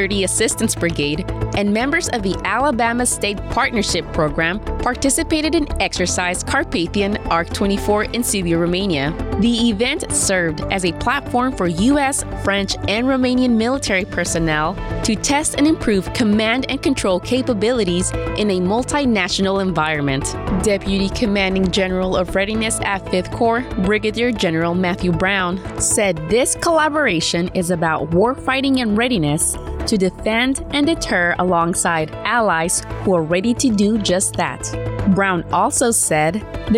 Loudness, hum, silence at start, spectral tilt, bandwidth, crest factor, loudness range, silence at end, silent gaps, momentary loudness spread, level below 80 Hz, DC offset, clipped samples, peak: -18 LUFS; none; 0 s; -4 dB/octave; 16.5 kHz; 12 dB; 1 LU; 0 s; none; 4 LU; -34 dBFS; under 0.1%; under 0.1%; -6 dBFS